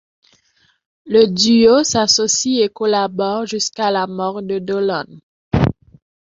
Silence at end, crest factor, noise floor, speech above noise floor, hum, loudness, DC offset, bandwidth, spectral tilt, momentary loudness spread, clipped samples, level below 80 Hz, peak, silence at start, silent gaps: 0.6 s; 16 dB; -59 dBFS; 44 dB; none; -16 LUFS; under 0.1%; 8 kHz; -4 dB/octave; 10 LU; under 0.1%; -42 dBFS; 0 dBFS; 1.05 s; 5.23-5.51 s